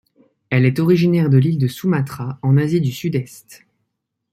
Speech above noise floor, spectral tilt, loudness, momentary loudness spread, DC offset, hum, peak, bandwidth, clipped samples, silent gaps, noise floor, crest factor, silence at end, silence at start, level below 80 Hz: 59 dB; -8 dB/octave; -17 LUFS; 9 LU; under 0.1%; none; -2 dBFS; 15.5 kHz; under 0.1%; none; -75 dBFS; 16 dB; 0.75 s; 0.5 s; -56 dBFS